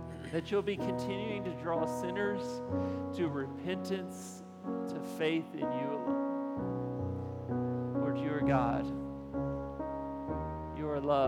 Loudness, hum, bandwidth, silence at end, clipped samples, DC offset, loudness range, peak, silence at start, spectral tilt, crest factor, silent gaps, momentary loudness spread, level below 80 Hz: -36 LUFS; none; 15.5 kHz; 0 s; under 0.1%; under 0.1%; 2 LU; -16 dBFS; 0 s; -7 dB/octave; 20 dB; none; 7 LU; -56 dBFS